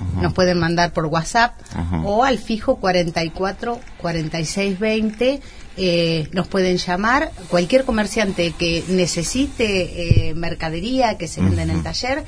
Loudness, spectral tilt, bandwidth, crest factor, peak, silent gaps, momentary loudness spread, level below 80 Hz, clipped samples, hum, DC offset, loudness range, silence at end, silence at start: -20 LUFS; -5 dB/octave; 11 kHz; 18 dB; 0 dBFS; none; 7 LU; -34 dBFS; under 0.1%; none; under 0.1%; 2 LU; 0 s; 0 s